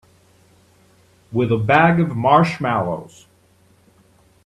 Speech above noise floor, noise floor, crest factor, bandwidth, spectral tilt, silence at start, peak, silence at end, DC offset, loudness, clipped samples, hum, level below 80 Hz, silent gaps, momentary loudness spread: 38 dB; -55 dBFS; 20 dB; 10.5 kHz; -7.5 dB/octave; 1.3 s; 0 dBFS; 1.4 s; under 0.1%; -17 LUFS; under 0.1%; none; -54 dBFS; none; 12 LU